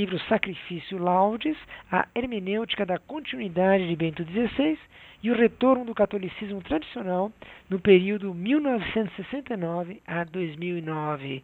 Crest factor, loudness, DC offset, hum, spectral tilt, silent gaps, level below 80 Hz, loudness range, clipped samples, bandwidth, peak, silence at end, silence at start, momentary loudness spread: 22 dB; -26 LUFS; under 0.1%; none; -8.5 dB/octave; none; -56 dBFS; 2 LU; under 0.1%; 4.4 kHz; -4 dBFS; 0.05 s; 0 s; 11 LU